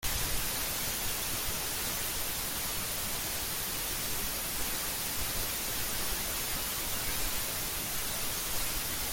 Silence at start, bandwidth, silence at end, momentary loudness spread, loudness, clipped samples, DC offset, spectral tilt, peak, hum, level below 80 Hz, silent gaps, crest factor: 0 s; 17 kHz; 0 s; 1 LU; -32 LUFS; under 0.1%; under 0.1%; -1 dB/octave; -18 dBFS; none; -46 dBFS; none; 16 dB